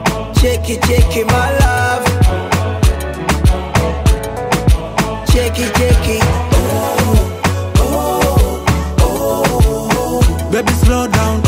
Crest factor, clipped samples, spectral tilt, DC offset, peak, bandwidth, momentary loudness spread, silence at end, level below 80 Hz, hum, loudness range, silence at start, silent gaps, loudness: 12 dB; under 0.1%; -5.5 dB/octave; under 0.1%; 0 dBFS; 16.5 kHz; 4 LU; 0 s; -16 dBFS; none; 1 LU; 0 s; none; -14 LUFS